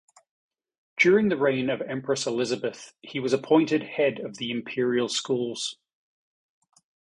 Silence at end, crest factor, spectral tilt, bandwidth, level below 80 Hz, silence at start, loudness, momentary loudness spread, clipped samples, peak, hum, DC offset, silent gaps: 1.4 s; 20 dB; -4.5 dB/octave; 11 kHz; -68 dBFS; 0.95 s; -25 LUFS; 12 LU; under 0.1%; -8 dBFS; none; under 0.1%; none